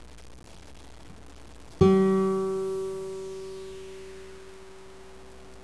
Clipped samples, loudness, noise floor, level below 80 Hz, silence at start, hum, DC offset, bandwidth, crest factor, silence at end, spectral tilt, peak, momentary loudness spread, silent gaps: under 0.1%; -26 LUFS; -48 dBFS; -50 dBFS; 0 s; none; 0.4%; 11 kHz; 22 dB; 0 s; -7.5 dB/octave; -8 dBFS; 28 LU; none